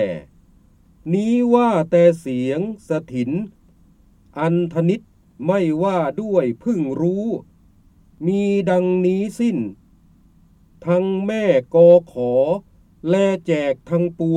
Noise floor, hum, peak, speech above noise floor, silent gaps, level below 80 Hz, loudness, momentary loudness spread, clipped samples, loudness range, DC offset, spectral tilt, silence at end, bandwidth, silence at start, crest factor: -52 dBFS; none; -2 dBFS; 34 dB; none; -54 dBFS; -19 LUFS; 11 LU; under 0.1%; 5 LU; under 0.1%; -8 dB/octave; 0 s; 10.5 kHz; 0 s; 18 dB